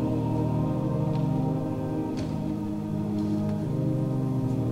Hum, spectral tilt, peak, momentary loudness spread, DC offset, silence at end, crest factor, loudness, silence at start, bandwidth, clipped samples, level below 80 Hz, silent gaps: none; -9.5 dB/octave; -16 dBFS; 4 LU; under 0.1%; 0 s; 12 dB; -28 LUFS; 0 s; 13 kHz; under 0.1%; -46 dBFS; none